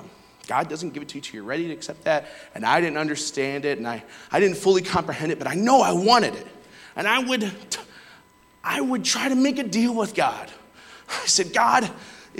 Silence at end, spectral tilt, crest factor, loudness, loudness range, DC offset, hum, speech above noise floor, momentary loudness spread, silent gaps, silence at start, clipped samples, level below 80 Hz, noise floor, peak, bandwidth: 0 s; -3 dB/octave; 18 dB; -23 LUFS; 5 LU; under 0.1%; none; 31 dB; 15 LU; none; 0 s; under 0.1%; -62 dBFS; -54 dBFS; -4 dBFS; 17 kHz